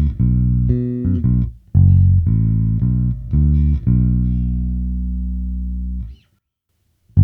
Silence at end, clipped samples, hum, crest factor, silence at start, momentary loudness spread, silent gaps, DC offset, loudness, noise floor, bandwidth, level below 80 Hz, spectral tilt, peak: 0 s; under 0.1%; none; 16 dB; 0 s; 12 LU; none; under 0.1%; -18 LUFS; -68 dBFS; 2.4 kHz; -22 dBFS; -13.5 dB/octave; 0 dBFS